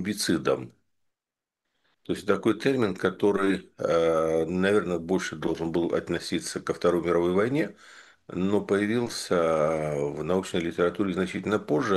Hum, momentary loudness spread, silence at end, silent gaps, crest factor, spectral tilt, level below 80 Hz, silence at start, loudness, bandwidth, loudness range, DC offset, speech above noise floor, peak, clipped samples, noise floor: none; 6 LU; 0 s; none; 18 dB; -5.5 dB/octave; -58 dBFS; 0 s; -26 LUFS; 12.5 kHz; 3 LU; under 0.1%; 64 dB; -8 dBFS; under 0.1%; -90 dBFS